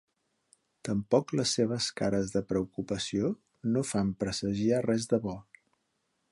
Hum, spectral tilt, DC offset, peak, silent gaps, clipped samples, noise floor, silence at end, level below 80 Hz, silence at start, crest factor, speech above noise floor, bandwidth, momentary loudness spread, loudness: none; -5 dB/octave; under 0.1%; -10 dBFS; none; under 0.1%; -78 dBFS; 0.9 s; -58 dBFS; 0.85 s; 20 dB; 48 dB; 11.5 kHz; 7 LU; -30 LUFS